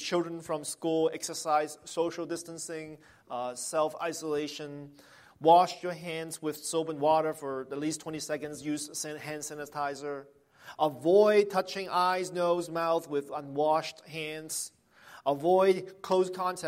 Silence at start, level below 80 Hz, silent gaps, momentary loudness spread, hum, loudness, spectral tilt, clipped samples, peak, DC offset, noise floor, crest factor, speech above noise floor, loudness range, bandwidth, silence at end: 0 s; -76 dBFS; none; 14 LU; none; -30 LUFS; -4 dB/octave; under 0.1%; -10 dBFS; under 0.1%; -55 dBFS; 20 dB; 25 dB; 7 LU; 16 kHz; 0 s